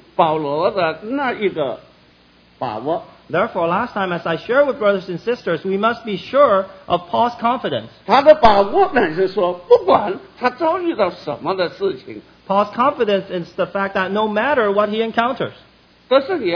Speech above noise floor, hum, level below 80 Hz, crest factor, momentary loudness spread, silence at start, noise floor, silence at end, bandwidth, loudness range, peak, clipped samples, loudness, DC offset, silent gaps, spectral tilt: 34 dB; none; -46 dBFS; 18 dB; 11 LU; 0.2 s; -51 dBFS; 0 s; 5.4 kHz; 6 LU; 0 dBFS; under 0.1%; -18 LUFS; under 0.1%; none; -7 dB/octave